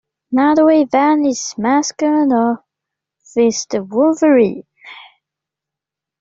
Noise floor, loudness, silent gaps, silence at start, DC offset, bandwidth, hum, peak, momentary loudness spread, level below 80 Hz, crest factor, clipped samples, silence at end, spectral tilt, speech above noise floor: -85 dBFS; -15 LUFS; none; 0.3 s; under 0.1%; 7.8 kHz; none; -2 dBFS; 9 LU; -62 dBFS; 14 dB; under 0.1%; 1.2 s; -4.5 dB/octave; 71 dB